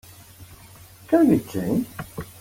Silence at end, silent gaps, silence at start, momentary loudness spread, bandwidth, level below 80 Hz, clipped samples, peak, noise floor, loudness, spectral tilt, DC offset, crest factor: 0.1 s; none; 0.4 s; 17 LU; 17 kHz; -52 dBFS; under 0.1%; -6 dBFS; -47 dBFS; -22 LUFS; -7 dB/octave; under 0.1%; 18 dB